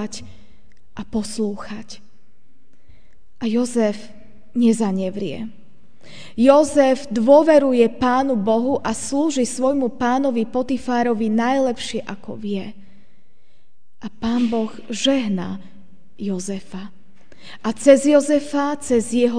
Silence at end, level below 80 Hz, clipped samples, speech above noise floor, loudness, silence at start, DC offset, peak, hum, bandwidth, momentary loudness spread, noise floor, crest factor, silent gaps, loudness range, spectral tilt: 0 s; -52 dBFS; under 0.1%; 45 dB; -19 LUFS; 0 s; 2%; 0 dBFS; none; 10 kHz; 20 LU; -64 dBFS; 20 dB; none; 10 LU; -5 dB/octave